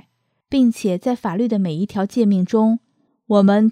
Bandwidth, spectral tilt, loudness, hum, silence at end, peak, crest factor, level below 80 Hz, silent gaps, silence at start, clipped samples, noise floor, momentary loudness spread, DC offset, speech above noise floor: 11 kHz; -7.5 dB/octave; -18 LUFS; none; 0 s; -2 dBFS; 14 dB; -58 dBFS; none; 0.5 s; under 0.1%; -64 dBFS; 7 LU; under 0.1%; 47 dB